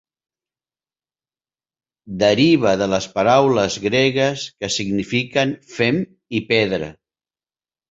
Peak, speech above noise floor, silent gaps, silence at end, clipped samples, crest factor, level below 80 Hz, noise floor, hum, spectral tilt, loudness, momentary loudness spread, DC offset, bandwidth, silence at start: -2 dBFS; over 72 dB; none; 1 s; under 0.1%; 18 dB; -52 dBFS; under -90 dBFS; none; -5 dB/octave; -18 LUFS; 11 LU; under 0.1%; 8 kHz; 2.05 s